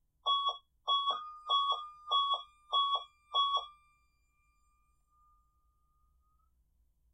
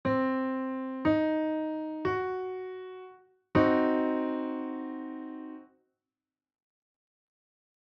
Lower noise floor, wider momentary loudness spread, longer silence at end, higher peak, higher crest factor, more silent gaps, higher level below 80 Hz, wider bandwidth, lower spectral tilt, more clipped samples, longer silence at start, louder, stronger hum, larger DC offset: second, -74 dBFS vs under -90 dBFS; second, 7 LU vs 17 LU; first, 3.4 s vs 2.35 s; second, -20 dBFS vs -12 dBFS; about the same, 16 dB vs 20 dB; neither; second, -74 dBFS vs -64 dBFS; first, 8.4 kHz vs 5.8 kHz; second, 0 dB/octave vs -5.5 dB/octave; neither; first, 0.25 s vs 0.05 s; about the same, -33 LUFS vs -31 LUFS; neither; neither